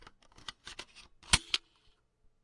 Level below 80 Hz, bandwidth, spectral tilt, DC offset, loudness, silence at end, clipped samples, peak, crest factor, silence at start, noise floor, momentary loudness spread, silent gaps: -52 dBFS; 11.5 kHz; -0.5 dB/octave; under 0.1%; -30 LUFS; 0.85 s; under 0.1%; -8 dBFS; 30 dB; 0.65 s; -69 dBFS; 23 LU; none